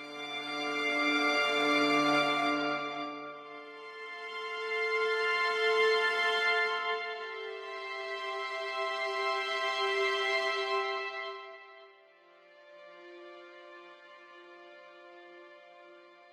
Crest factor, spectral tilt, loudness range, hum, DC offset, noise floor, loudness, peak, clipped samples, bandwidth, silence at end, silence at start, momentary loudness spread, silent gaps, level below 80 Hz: 18 dB; -2.5 dB/octave; 22 LU; none; under 0.1%; -60 dBFS; -30 LUFS; -16 dBFS; under 0.1%; 14.5 kHz; 0.1 s; 0 s; 24 LU; none; under -90 dBFS